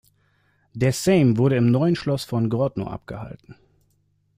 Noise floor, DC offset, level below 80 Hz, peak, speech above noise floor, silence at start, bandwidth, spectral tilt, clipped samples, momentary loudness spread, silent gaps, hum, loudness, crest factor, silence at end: -66 dBFS; under 0.1%; -52 dBFS; -6 dBFS; 45 dB; 0.75 s; 15.5 kHz; -7 dB/octave; under 0.1%; 18 LU; none; none; -21 LUFS; 16 dB; 0.85 s